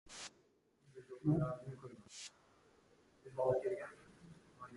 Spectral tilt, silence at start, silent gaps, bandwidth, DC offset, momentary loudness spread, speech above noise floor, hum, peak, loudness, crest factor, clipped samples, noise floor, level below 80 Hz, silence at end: -6.5 dB/octave; 0.05 s; none; 11.5 kHz; under 0.1%; 25 LU; 34 dB; none; -24 dBFS; -41 LUFS; 20 dB; under 0.1%; -74 dBFS; -70 dBFS; 0 s